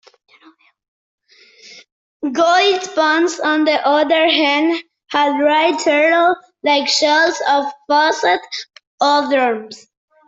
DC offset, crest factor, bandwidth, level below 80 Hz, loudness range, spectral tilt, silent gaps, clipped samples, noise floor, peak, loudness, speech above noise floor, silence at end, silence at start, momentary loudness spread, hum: under 0.1%; 16 dB; 8 kHz; -68 dBFS; 3 LU; -1.5 dB/octave; 1.92-2.20 s, 8.87-8.98 s; under 0.1%; -50 dBFS; -2 dBFS; -15 LUFS; 35 dB; 0.5 s; 1.65 s; 9 LU; none